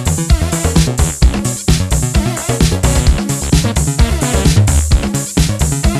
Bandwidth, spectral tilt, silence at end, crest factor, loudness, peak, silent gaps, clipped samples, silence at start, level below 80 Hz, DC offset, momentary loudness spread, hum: 14 kHz; -4.5 dB/octave; 0 s; 12 dB; -14 LUFS; 0 dBFS; none; under 0.1%; 0 s; -16 dBFS; under 0.1%; 3 LU; none